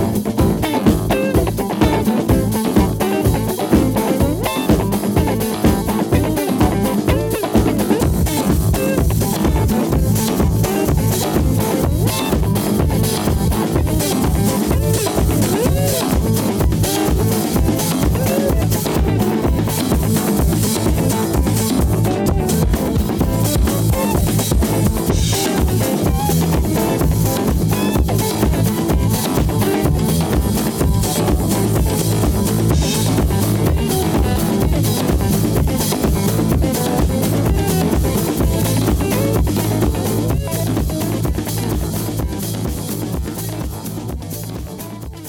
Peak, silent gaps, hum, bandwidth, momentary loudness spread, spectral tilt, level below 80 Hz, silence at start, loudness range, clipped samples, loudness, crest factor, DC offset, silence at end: 0 dBFS; none; none; 19 kHz; 3 LU; -5.5 dB/octave; -24 dBFS; 0 s; 1 LU; under 0.1%; -17 LUFS; 16 dB; under 0.1%; 0 s